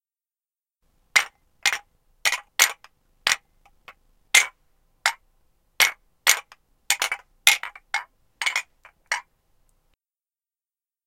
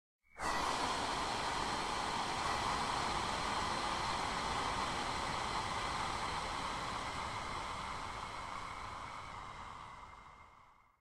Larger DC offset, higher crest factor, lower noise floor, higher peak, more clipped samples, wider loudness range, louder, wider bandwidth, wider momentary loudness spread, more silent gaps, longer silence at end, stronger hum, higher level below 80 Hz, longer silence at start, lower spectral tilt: neither; first, 28 dB vs 16 dB; first, under -90 dBFS vs -64 dBFS; first, 0 dBFS vs -24 dBFS; neither; second, 3 LU vs 8 LU; first, -22 LUFS vs -38 LUFS; about the same, 17 kHz vs 15.5 kHz; about the same, 11 LU vs 12 LU; neither; first, 1.85 s vs 0.25 s; neither; second, -66 dBFS vs -54 dBFS; first, 1.15 s vs 0.35 s; second, 3.5 dB/octave vs -3 dB/octave